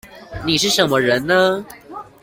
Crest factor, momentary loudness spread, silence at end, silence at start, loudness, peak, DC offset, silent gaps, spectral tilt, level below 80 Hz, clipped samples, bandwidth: 16 dB; 20 LU; 0.2 s; 0.05 s; -16 LUFS; -2 dBFS; under 0.1%; none; -3.5 dB/octave; -48 dBFS; under 0.1%; 17 kHz